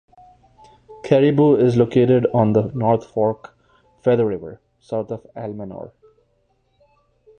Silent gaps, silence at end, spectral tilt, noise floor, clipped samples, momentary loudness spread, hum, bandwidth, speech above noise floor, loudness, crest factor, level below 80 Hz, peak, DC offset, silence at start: none; 1.55 s; -9 dB/octave; -64 dBFS; under 0.1%; 19 LU; none; 9 kHz; 47 dB; -18 LUFS; 18 dB; -54 dBFS; -2 dBFS; under 0.1%; 0.9 s